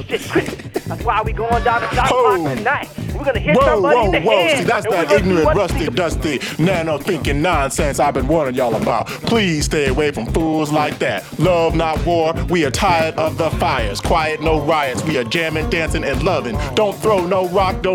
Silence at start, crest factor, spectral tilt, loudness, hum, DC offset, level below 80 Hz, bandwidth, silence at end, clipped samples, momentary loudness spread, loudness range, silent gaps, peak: 0 s; 14 dB; -5 dB/octave; -17 LUFS; none; under 0.1%; -30 dBFS; 19 kHz; 0 s; under 0.1%; 6 LU; 3 LU; none; -2 dBFS